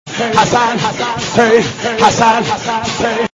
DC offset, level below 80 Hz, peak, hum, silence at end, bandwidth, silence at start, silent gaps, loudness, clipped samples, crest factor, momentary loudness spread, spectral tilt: under 0.1%; -44 dBFS; 0 dBFS; none; 0.05 s; 11 kHz; 0.05 s; none; -13 LUFS; 0.3%; 14 dB; 7 LU; -3.5 dB/octave